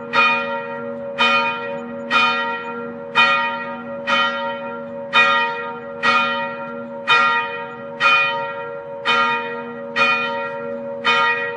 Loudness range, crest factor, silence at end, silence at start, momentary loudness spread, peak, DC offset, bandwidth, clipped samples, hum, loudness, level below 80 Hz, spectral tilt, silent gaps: 1 LU; 18 dB; 0 s; 0 s; 14 LU; -2 dBFS; under 0.1%; 10.5 kHz; under 0.1%; none; -18 LUFS; -68 dBFS; -3 dB/octave; none